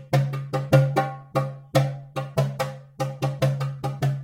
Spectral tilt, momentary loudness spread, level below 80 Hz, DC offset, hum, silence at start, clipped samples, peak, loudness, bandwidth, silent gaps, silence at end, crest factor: -7 dB/octave; 11 LU; -56 dBFS; under 0.1%; none; 0 s; under 0.1%; -4 dBFS; -25 LUFS; 16.5 kHz; none; 0 s; 20 dB